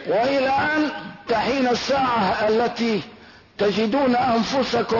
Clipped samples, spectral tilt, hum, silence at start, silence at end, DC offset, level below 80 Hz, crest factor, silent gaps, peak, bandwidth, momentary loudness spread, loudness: under 0.1%; -5 dB/octave; none; 0 s; 0 s; under 0.1%; -54 dBFS; 12 dB; none; -10 dBFS; 6 kHz; 5 LU; -21 LUFS